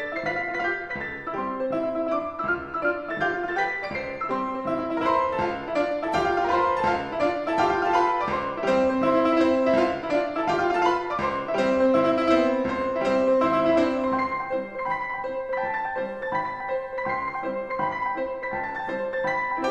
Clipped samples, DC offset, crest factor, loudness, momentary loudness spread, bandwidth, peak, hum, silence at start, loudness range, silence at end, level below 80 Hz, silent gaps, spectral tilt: under 0.1%; 0.2%; 16 dB; -25 LUFS; 8 LU; 9.4 kHz; -8 dBFS; none; 0 s; 6 LU; 0 s; -54 dBFS; none; -6 dB/octave